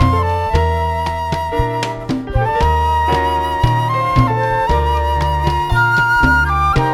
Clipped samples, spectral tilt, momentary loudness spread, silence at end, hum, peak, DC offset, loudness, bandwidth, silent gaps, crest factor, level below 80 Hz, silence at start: under 0.1%; -6.5 dB/octave; 7 LU; 0 s; none; 0 dBFS; under 0.1%; -15 LUFS; 15 kHz; none; 14 dB; -22 dBFS; 0 s